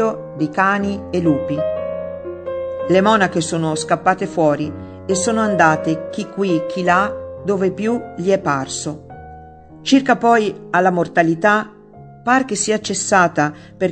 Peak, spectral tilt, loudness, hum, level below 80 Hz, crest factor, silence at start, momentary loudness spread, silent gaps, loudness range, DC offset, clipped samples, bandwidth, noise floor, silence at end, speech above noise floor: 0 dBFS; -4.5 dB/octave; -18 LUFS; none; -52 dBFS; 18 dB; 0 s; 12 LU; none; 3 LU; under 0.1%; under 0.1%; 9.4 kHz; -40 dBFS; 0 s; 23 dB